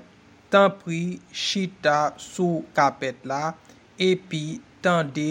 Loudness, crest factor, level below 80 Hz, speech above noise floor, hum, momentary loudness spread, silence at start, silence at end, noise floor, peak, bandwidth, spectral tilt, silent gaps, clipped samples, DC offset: -24 LUFS; 22 dB; -68 dBFS; 28 dB; none; 11 LU; 0.5 s; 0 s; -52 dBFS; -4 dBFS; 16 kHz; -5 dB/octave; none; under 0.1%; under 0.1%